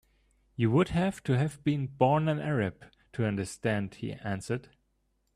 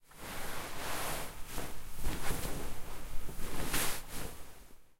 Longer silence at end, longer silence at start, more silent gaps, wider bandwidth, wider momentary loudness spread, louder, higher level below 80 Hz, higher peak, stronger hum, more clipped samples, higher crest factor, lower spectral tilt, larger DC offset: first, 0.75 s vs 0.15 s; first, 0.6 s vs 0.15 s; neither; second, 13 kHz vs 16 kHz; about the same, 11 LU vs 12 LU; first, -30 LUFS vs -40 LUFS; second, -56 dBFS vs -42 dBFS; first, -10 dBFS vs -18 dBFS; neither; neither; first, 22 dB vs 16 dB; first, -7 dB/octave vs -3 dB/octave; neither